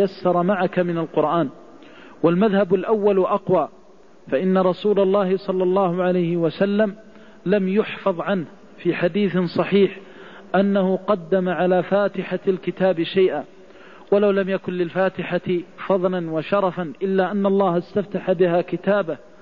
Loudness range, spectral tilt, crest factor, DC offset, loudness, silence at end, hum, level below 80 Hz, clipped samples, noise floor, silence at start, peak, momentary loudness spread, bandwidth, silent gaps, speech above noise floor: 2 LU; -9 dB/octave; 14 dB; 0.4%; -21 LUFS; 0.25 s; none; -62 dBFS; under 0.1%; -49 dBFS; 0 s; -6 dBFS; 7 LU; 5.4 kHz; none; 29 dB